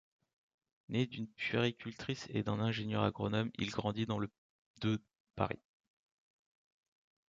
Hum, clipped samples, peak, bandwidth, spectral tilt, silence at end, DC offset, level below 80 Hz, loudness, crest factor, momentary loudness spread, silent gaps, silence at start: none; under 0.1%; -16 dBFS; 7.6 kHz; -6.5 dB/octave; 1.75 s; under 0.1%; -64 dBFS; -38 LUFS; 24 dB; 7 LU; 4.38-4.74 s, 5.20-5.34 s; 0.9 s